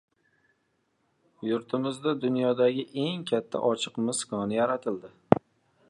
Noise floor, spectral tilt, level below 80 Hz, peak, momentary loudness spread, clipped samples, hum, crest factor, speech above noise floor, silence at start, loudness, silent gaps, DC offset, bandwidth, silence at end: -74 dBFS; -5 dB/octave; -64 dBFS; 0 dBFS; 6 LU; under 0.1%; none; 28 dB; 46 dB; 1.4 s; -28 LUFS; none; under 0.1%; 11.5 kHz; 0.5 s